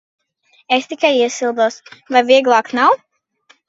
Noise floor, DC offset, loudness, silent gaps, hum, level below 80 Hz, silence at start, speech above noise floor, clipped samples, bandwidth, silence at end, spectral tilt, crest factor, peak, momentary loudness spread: -57 dBFS; under 0.1%; -15 LUFS; none; none; -68 dBFS; 0.7 s; 42 dB; under 0.1%; 8 kHz; 0.7 s; -2 dB/octave; 16 dB; 0 dBFS; 7 LU